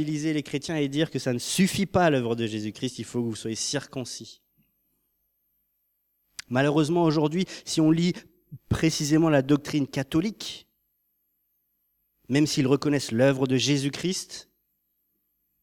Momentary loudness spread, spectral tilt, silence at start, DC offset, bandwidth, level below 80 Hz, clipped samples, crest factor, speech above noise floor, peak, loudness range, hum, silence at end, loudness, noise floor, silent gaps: 13 LU; -5 dB/octave; 0 s; under 0.1%; 17.5 kHz; -58 dBFS; under 0.1%; 18 dB; 50 dB; -8 dBFS; 8 LU; 50 Hz at -55 dBFS; 1.2 s; -25 LUFS; -75 dBFS; none